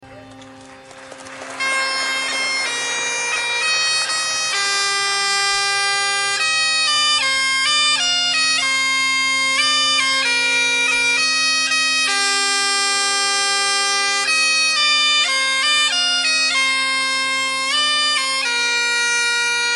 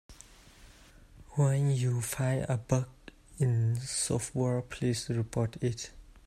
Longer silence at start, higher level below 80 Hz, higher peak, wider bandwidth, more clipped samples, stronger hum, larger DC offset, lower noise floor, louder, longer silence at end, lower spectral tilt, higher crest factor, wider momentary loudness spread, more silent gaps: about the same, 0 s vs 0.1 s; second, -64 dBFS vs -56 dBFS; first, -4 dBFS vs -12 dBFS; second, 12 kHz vs 14.5 kHz; neither; neither; neither; second, -40 dBFS vs -55 dBFS; first, -15 LUFS vs -31 LUFS; second, 0 s vs 0.25 s; second, 2 dB/octave vs -5.5 dB/octave; second, 14 dB vs 20 dB; second, 5 LU vs 8 LU; neither